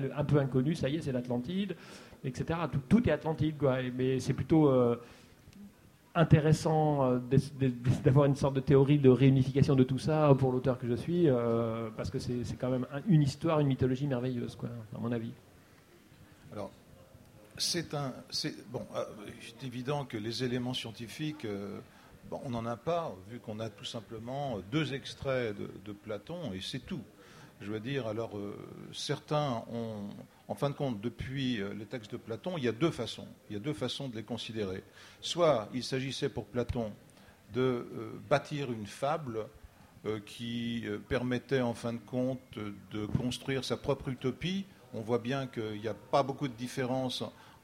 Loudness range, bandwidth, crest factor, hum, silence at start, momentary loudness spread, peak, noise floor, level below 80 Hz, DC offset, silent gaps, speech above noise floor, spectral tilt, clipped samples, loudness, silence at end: 11 LU; 15 kHz; 22 dB; none; 0 s; 16 LU; -10 dBFS; -60 dBFS; -58 dBFS; under 0.1%; none; 28 dB; -6.5 dB/octave; under 0.1%; -32 LUFS; 0.15 s